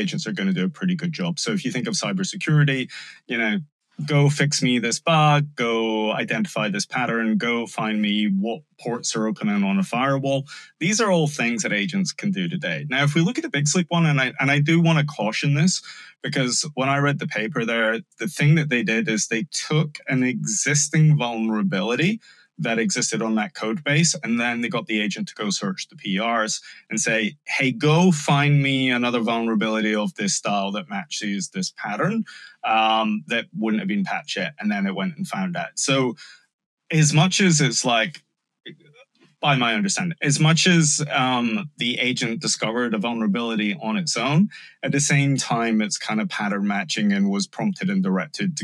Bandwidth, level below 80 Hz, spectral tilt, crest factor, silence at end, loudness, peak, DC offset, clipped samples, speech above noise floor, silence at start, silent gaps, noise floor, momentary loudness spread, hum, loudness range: 12 kHz; -74 dBFS; -4.5 dB/octave; 16 dB; 0 s; -22 LUFS; -6 dBFS; under 0.1%; under 0.1%; 33 dB; 0 s; 3.72-3.79 s, 36.53-36.59 s, 36.66-36.77 s; -55 dBFS; 9 LU; none; 3 LU